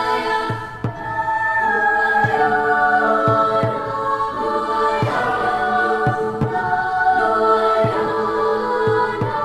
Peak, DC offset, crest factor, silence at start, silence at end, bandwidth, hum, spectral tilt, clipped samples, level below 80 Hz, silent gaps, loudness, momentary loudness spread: -4 dBFS; under 0.1%; 14 dB; 0 s; 0 s; 13 kHz; none; -6.5 dB/octave; under 0.1%; -48 dBFS; none; -18 LUFS; 6 LU